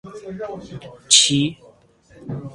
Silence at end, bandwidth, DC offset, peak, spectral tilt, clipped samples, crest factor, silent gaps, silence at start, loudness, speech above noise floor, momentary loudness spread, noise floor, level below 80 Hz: 0 s; 16 kHz; under 0.1%; 0 dBFS; -2 dB/octave; under 0.1%; 22 dB; none; 0.05 s; -15 LUFS; 30 dB; 24 LU; -51 dBFS; -56 dBFS